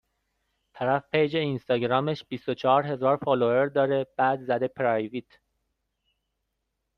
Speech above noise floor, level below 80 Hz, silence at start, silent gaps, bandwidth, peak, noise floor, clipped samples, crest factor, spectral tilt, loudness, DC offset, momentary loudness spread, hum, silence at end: 55 dB; -66 dBFS; 0.75 s; none; 6.4 kHz; -8 dBFS; -80 dBFS; under 0.1%; 18 dB; -8 dB/octave; -26 LUFS; under 0.1%; 8 LU; none; 1.75 s